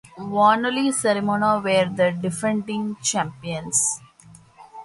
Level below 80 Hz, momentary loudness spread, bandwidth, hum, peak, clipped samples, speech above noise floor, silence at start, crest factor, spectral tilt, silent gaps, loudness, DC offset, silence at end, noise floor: -60 dBFS; 10 LU; 12 kHz; none; -4 dBFS; under 0.1%; 28 dB; 0.15 s; 18 dB; -3.5 dB/octave; none; -21 LUFS; under 0.1%; 0 s; -49 dBFS